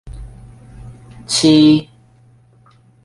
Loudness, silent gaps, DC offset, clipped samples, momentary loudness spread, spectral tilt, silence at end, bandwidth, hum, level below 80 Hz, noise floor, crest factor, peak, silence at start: -12 LUFS; none; under 0.1%; under 0.1%; 27 LU; -5 dB/octave; 1.2 s; 11.5 kHz; none; -42 dBFS; -50 dBFS; 16 dB; -2 dBFS; 0.05 s